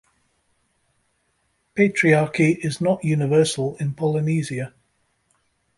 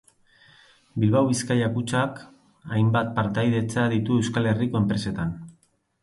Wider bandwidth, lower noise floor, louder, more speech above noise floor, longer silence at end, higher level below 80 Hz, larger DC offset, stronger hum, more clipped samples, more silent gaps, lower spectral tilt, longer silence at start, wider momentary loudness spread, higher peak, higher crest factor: about the same, 11.5 kHz vs 11.5 kHz; first, -69 dBFS vs -63 dBFS; first, -21 LUFS vs -24 LUFS; first, 49 dB vs 40 dB; first, 1.1 s vs 0.5 s; second, -60 dBFS vs -52 dBFS; neither; neither; neither; neither; about the same, -6 dB/octave vs -6.5 dB/octave; first, 1.75 s vs 0.95 s; first, 11 LU vs 8 LU; first, -4 dBFS vs -8 dBFS; about the same, 18 dB vs 16 dB